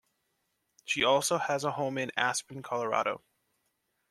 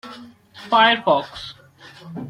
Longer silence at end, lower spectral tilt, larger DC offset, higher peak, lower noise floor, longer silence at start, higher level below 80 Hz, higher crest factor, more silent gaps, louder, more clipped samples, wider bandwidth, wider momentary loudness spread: first, 0.95 s vs 0 s; second, -2.5 dB/octave vs -4.5 dB/octave; neither; second, -10 dBFS vs -2 dBFS; first, -79 dBFS vs -45 dBFS; first, 0.85 s vs 0.05 s; second, -74 dBFS vs -60 dBFS; about the same, 22 dB vs 20 dB; neither; second, -30 LUFS vs -17 LUFS; neither; first, 14 kHz vs 12 kHz; second, 10 LU vs 22 LU